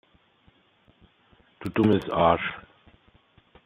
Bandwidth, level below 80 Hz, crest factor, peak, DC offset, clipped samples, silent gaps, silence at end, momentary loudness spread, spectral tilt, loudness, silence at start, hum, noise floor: 14 kHz; -58 dBFS; 22 dB; -6 dBFS; under 0.1%; under 0.1%; none; 1.05 s; 16 LU; -8 dB/octave; -24 LUFS; 1.6 s; none; -62 dBFS